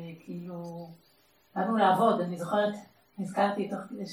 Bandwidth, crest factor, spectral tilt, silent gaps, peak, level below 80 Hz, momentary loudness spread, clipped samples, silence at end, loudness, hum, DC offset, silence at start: 15 kHz; 18 dB; -6.5 dB/octave; none; -12 dBFS; -82 dBFS; 19 LU; under 0.1%; 0 s; -29 LUFS; none; under 0.1%; 0 s